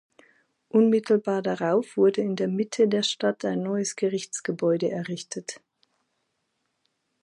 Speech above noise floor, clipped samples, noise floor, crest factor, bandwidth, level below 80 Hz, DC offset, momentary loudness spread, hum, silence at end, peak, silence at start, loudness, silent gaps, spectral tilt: 52 dB; under 0.1%; -76 dBFS; 16 dB; 11.5 kHz; -78 dBFS; under 0.1%; 12 LU; none; 1.65 s; -10 dBFS; 0.75 s; -25 LUFS; none; -5 dB/octave